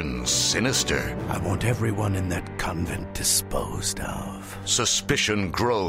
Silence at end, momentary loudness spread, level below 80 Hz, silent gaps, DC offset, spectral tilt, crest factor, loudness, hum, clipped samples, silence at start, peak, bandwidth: 0 s; 9 LU; -40 dBFS; none; under 0.1%; -3 dB/octave; 16 dB; -24 LUFS; none; under 0.1%; 0 s; -8 dBFS; 16 kHz